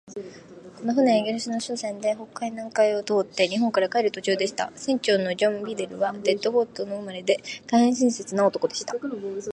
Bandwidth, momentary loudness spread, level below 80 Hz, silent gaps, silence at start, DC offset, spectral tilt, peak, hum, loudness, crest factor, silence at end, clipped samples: 10.5 kHz; 10 LU; -70 dBFS; none; 0.05 s; under 0.1%; -4 dB/octave; -6 dBFS; none; -25 LUFS; 18 dB; 0 s; under 0.1%